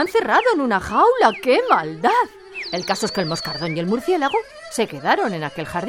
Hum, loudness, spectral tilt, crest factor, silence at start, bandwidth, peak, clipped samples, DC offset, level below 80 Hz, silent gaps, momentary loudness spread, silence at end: none; -19 LUFS; -4.5 dB/octave; 18 dB; 0 s; 17 kHz; 0 dBFS; under 0.1%; under 0.1%; -52 dBFS; none; 10 LU; 0 s